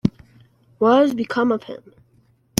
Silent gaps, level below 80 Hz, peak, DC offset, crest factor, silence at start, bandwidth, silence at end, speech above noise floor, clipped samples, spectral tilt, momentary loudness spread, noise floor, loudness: none; -56 dBFS; -2 dBFS; under 0.1%; 20 dB; 0.05 s; 13 kHz; 0.8 s; 40 dB; under 0.1%; -5.5 dB/octave; 19 LU; -58 dBFS; -19 LUFS